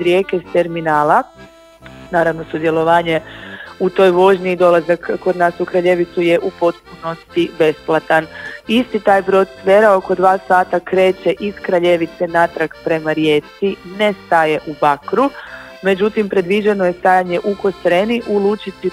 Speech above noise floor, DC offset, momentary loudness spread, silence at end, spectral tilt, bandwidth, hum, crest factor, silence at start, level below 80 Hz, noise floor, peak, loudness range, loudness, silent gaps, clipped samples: 25 dB; under 0.1%; 9 LU; 0 s; -6.5 dB/octave; 14.5 kHz; none; 16 dB; 0 s; -50 dBFS; -40 dBFS; 0 dBFS; 3 LU; -15 LUFS; none; under 0.1%